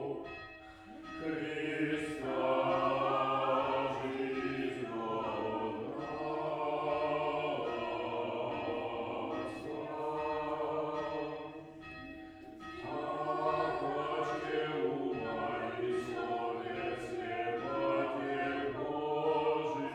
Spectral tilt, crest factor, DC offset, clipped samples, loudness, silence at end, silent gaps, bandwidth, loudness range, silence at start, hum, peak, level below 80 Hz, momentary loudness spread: -6 dB/octave; 16 dB; under 0.1%; under 0.1%; -36 LUFS; 0 s; none; 11 kHz; 5 LU; 0 s; none; -20 dBFS; -66 dBFS; 12 LU